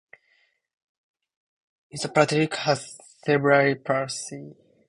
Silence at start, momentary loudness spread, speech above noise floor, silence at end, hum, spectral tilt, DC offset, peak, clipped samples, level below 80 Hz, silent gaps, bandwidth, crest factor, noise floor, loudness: 1.95 s; 18 LU; 44 dB; 0.35 s; none; -4.5 dB/octave; under 0.1%; -4 dBFS; under 0.1%; -68 dBFS; none; 11.5 kHz; 22 dB; -67 dBFS; -23 LUFS